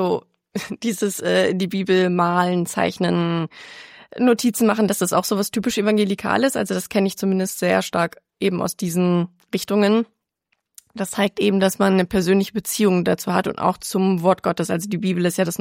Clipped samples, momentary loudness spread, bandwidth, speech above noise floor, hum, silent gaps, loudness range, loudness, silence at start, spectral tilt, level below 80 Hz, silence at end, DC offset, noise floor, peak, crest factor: under 0.1%; 8 LU; 16.5 kHz; 53 dB; none; none; 2 LU; -20 LUFS; 0 s; -5 dB/octave; -56 dBFS; 0.05 s; under 0.1%; -72 dBFS; -4 dBFS; 16 dB